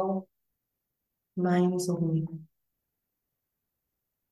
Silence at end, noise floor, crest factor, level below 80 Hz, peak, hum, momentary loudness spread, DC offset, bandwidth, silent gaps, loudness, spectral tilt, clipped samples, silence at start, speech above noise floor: 1.9 s; -84 dBFS; 18 dB; -80 dBFS; -16 dBFS; none; 14 LU; under 0.1%; 12.5 kHz; none; -29 LUFS; -7 dB/octave; under 0.1%; 0 s; 56 dB